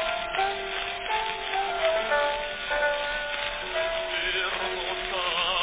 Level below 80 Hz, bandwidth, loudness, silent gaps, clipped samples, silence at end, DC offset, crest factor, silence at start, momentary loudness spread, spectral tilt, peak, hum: -50 dBFS; 4 kHz; -27 LUFS; none; under 0.1%; 0 s; under 0.1%; 18 dB; 0 s; 4 LU; 1.5 dB/octave; -10 dBFS; none